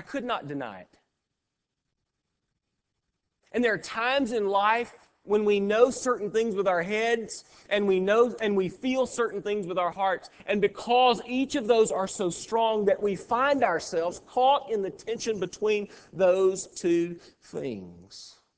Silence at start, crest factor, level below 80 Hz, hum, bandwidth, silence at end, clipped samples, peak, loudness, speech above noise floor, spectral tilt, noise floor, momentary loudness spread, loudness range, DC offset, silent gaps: 0 s; 20 dB; -64 dBFS; none; 8 kHz; 0.3 s; under 0.1%; -8 dBFS; -26 LUFS; 57 dB; -4.5 dB/octave; -84 dBFS; 13 LU; 5 LU; under 0.1%; none